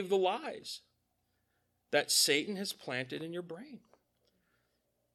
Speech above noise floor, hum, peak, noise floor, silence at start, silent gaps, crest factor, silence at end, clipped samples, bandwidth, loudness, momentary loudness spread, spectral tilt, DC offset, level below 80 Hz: 45 dB; 60 Hz at -75 dBFS; -14 dBFS; -79 dBFS; 0 s; none; 22 dB; 1.35 s; under 0.1%; 17 kHz; -32 LUFS; 20 LU; -2 dB/octave; under 0.1%; -84 dBFS